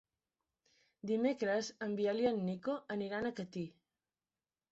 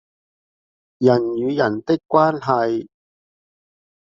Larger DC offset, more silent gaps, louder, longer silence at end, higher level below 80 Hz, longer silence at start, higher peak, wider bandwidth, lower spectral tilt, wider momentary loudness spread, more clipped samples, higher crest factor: neither; neither; second, -37 LUFS vs -19 LUFS; second, 1 s vs 1.3 s; second, -76 dBFS vs -64 dBFS; about the same, 1.05 s vs 1 s; second, -20 dBFS vs -2 dBFS; about the same, 8 kHz vs 7.4 kHz; about the same, -5 dB/octave vs -6 dB/octave; first, 10 LU vs 5 LU; neither; about the same, 18 dB vs 20 dB